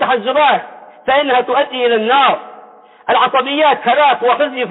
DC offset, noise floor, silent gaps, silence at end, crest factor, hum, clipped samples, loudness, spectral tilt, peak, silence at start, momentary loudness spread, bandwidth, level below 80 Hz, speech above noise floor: under 0.1%; -40 dBFS; none; 0 s; 12 dB; none; under 0.1%; -13 LUFS; -8.5 dB/octave; -2 dBFS; 0 s; 5 LU; 4.1 kHz; -66 dBFS; 28 dB